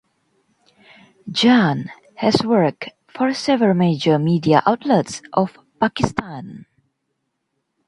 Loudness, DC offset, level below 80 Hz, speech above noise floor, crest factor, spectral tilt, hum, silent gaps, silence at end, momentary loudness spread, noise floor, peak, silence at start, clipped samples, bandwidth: -18 LUFS; under 0.1%; -52 dBFS; 56 dB; 20 dB; -6 dB/octave; none; none; 1.3 s; 18 LU; -74 dBFS; 0 dBFS; 1.25 s; under 0.1%; 11 kHz